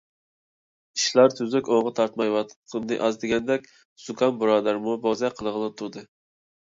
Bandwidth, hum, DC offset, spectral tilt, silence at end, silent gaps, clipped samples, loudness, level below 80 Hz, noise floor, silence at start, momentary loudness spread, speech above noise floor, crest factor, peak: 7.8 kHz; none; under 0.1%; -4 dB/octave; 0.7 s; 2.56-2.63 s, 3.85-3.96 s; under 0.1%; -24 LUFS; -64 dBFS; under -90 dBFS; 0.95 s; 14 LU; over 66 dB; 20 dB; -6 dBFS